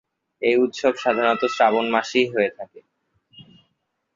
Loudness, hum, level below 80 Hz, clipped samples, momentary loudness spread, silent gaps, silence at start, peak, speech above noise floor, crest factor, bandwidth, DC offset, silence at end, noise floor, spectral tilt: -20 LUFS; none; -66 dBFS; under 0.1%; 7 LU; none; 0.4 s; -4 dBFS; 53 dB; 20 dB; 7.6 kHz; under 0.1%; 0.75 s; -73 dBFS; -4 dB/octave